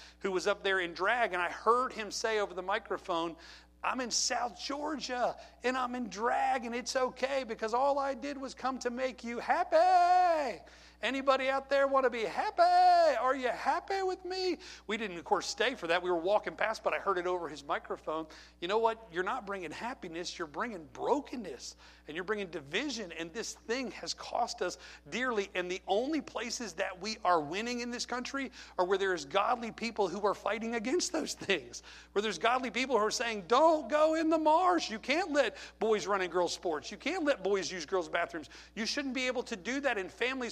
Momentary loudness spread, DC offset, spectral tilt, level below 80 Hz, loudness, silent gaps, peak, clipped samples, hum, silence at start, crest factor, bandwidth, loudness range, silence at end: 11 LU; under 0.1%; -3 dB/octave; -64 dBFS; -32 LUFS; none; -12 dBFS; under 0.1%; none; 0 s; 20 dB; 13.5 kHz; 7 LU; 0 s